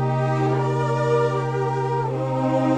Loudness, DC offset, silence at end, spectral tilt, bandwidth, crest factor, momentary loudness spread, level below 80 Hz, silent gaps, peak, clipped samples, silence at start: -22 LUFS; under 0.1%; 0 s; -8 dB/octave; 8.8 kHz; 12 dB; 3 LU; -50 dBFS; none; -8 dBFS; under 0.1%; 0 s